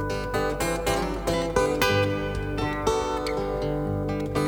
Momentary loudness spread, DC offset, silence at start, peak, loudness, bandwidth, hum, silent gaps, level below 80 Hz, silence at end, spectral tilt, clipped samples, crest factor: 6 LU; under 0.1%; 0 s; -8 dBFS; -26 LUFS; over 20 kHz; none; none; -38 dBFS; 0 s; -5 dB/octave; under 0.1%; 18 dB